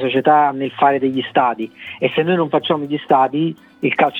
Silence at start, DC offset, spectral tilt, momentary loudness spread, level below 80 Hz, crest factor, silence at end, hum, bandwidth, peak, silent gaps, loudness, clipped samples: 0 s; under 0.1%; -8 dB/octave; 8 LU; -68 dBFS; 16 dB; 0 s; none; 4.3 kHz; 0 dBFS; none; -17 LUFS; under 0.1%